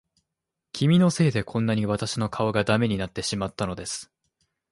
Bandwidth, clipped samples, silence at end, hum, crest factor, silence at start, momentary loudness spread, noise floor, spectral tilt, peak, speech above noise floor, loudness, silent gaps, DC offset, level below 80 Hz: 11.5 kHz; under 0.1%; 0.65 s; none; 18 dB; 0.75 s; 12 LU; -85 dBFS; -5.5 dB/octave; -6 dBFS; 61 dB; -25 LUFS; none; under 0.1%; -52 dBFS